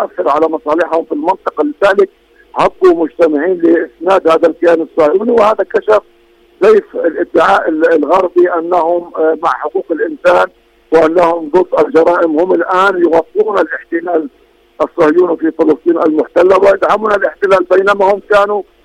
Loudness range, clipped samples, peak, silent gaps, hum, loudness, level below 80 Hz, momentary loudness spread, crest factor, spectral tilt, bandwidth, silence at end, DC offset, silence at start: 2 LU; under 0.1%; 0 dBFS; none; none; -11 LUFS; -48 dBFS; 6 LU; 10 dB; -6 dB/octave; 10.5 kHz; 0.25 s; under 0.1%; 0 s